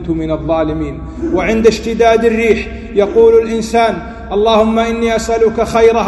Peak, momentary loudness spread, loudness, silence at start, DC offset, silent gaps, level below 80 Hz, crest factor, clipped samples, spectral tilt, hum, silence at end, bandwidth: 0 dBFS; 8 LU; -12 LUFS; 0 s; under 0.1%; none; -30 dBFS; 12 dB; 0.2%; -5.5 dB/octave; none; 0 s; 12 kHz